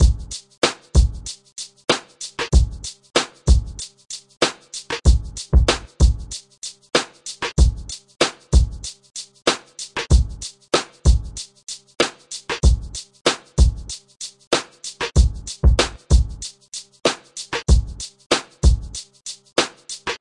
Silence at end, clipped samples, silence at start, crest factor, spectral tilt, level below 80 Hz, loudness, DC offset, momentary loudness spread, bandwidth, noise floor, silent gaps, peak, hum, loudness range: 0.05 s; under 0.1%; 0 s; 18 dB; -4.5 dB/octave; -22 dBFS; -21 LUFS; under 0.1%; 15 LU; 11.5 kHz; -38 dBFS; 0.58-0.62 s, 13.21-13.25 s, 14.47-14.51 s, 18.26-18.30 s; -2 dBFS; none; 2 LU